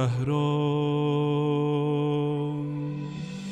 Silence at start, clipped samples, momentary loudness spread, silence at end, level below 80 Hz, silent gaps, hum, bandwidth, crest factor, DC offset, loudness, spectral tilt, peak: 0 s; under 0.1%; 8 LU; 0 s; -60 dBFS; none; none; 8.8 kHz; 12 dB; under 0.1%; -27 LUFS; -8 dB/octave; -14 dBFS